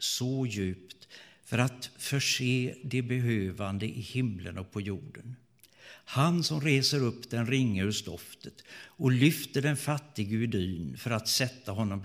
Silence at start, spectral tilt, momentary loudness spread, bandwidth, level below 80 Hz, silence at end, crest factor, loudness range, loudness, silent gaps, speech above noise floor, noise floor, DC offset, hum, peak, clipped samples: 0 s; -5 dB/octave; 20 LU; 16.5 kHz; -64 dBFS; 0 s; 22 dB; 4 LU; -30 LUFS; none; 24 dB; -54 dBFS; under 0.1%; none; -10 dBFS; under 0.1%